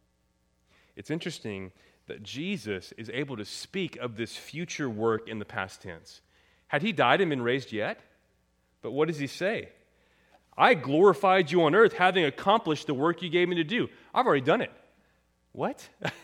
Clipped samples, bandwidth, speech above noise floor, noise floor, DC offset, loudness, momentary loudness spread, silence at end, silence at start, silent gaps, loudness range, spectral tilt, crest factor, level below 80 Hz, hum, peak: under 0.1%; 15.5 kHz; 44 dB; -71 dBFS; under 0.1%; -27 LUFS; 16 LU; 0.05 s; 0.95 s; none; 12 LU; -5.5 dB/octave; 24 dB; -70 dBFS; none; -4 dBFS